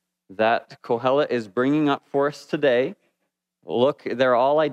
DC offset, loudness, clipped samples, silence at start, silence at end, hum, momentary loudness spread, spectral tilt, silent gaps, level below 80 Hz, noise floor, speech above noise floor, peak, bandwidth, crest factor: under 0.1%; -22 LUFS; under 0.1%; 0.3 s; 0 s; none; 6 LU; -6.5 dB/octave; none; -78 dBFS; -78 dBFS; 57 dB; -6 dBFS; 10 kHz; 16 dB